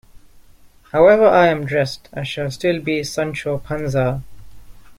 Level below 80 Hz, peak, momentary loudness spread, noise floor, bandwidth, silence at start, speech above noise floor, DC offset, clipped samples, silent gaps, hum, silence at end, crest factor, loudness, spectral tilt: -44 dBFS; -2 dBFS; 13 LU; -47 dBFS; 16 kHz; 0.15 s; 30 dB; under 0.1%; under 0.1%; none; none; 0.05 s; 18 dB; -18 LUFS; -6 dB/octave